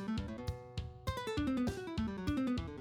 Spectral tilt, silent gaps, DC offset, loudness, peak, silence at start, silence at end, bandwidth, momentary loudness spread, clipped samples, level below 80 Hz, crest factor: -6.5 dB/octave; none; under 0.1%; -39 LUFS; -24 dBFS; 0 s; 0 s; 18.5 kHz; 8 LU; under 0.1%; -50 dBFS; 14 dB